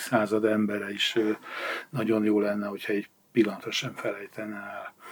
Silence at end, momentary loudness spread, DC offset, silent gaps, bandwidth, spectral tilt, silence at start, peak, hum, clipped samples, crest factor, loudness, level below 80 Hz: 0 s; 12 LU; under 0.1%; none; over 20 kHz; -5 dB/octave; 0 s; -8 dBFS; none; under 0.1%; 20 dB; -28 LUFS; -84 dBFS